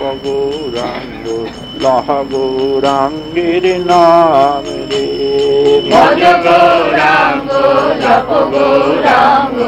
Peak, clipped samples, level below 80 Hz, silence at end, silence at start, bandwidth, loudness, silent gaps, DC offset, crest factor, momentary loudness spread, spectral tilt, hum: 0 dBFS; 0.9%; -40 dBFS; 0 s; 0 s; 12 kHz; -11 LUFS; none; under 0.1%; 10 dB; 11 LU; -5 dB/octave; none